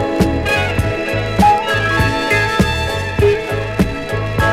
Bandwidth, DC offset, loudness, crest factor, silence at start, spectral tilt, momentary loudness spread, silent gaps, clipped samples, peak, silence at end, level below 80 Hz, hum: 16 kHz; under 0.1%; -15 LUFS; 10 dB; 0 s; -5.5 dB/octave; 6 LU; none; under 0.1%; -4 dBFS; 0 s; -28 dBFS; none